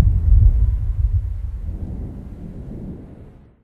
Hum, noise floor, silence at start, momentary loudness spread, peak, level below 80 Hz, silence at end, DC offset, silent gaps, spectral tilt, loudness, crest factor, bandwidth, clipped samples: none; -42 dBFS; 0 s; 19 LU; -2 dBFS; -20 dBFS; 0.35 s; under 0.1%; none; -11 dB/octave; -21 LUFS; 18 dB; 1.7 kHz; under 0.1%